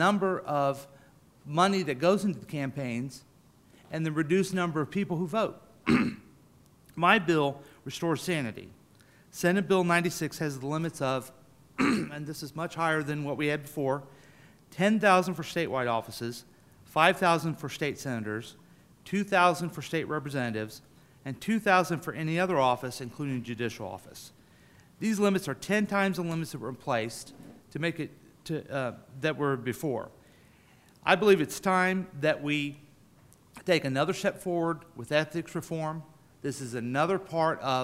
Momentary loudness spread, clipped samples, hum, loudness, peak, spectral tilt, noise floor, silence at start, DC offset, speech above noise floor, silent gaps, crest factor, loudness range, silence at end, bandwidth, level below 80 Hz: 15 LU; under 0.1%; none; -29 LUFS; -6 dBFS; -5.5 dB/octave; -59 dBFS; 0 s; under 0.1%; 30 dB; none; 24 dB; 4 LU; 0 s; 16 kHz; -66 dBFS